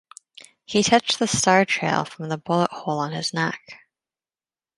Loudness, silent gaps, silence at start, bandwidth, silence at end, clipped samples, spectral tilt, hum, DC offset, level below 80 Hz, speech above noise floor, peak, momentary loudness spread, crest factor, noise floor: -22 LUFS; none; 0.7 s; 11.5 kHz; 1.05 s; under 0.1%; -3.5 dB/octave; none; under 0.1%; -60 dBFS; over 68 dB; -2 dBFS; 9 LU; 22 dB; under -90 dBFS